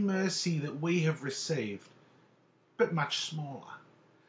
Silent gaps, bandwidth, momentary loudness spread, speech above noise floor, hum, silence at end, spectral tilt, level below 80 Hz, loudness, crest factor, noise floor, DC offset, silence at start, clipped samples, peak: none; 8 kHz; 17 LU; 34 dB; none; 0.5 s; -5 dB/octave; -80 dBFS; -33 LUFS; 20 dB; -67 dBFS; under 0.1%; 0 s; under 0.1%; -14 dBFS